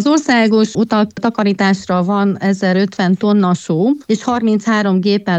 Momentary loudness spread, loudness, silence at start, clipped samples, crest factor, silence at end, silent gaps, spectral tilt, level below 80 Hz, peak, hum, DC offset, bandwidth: 4 LU; -14 LUFS; 0 s; under 0.1%; 12 dB; 0 s; none; -6 dB/octave; -56 dBFS; -2 dBFS; none; under 0.1%; 8.4 kHz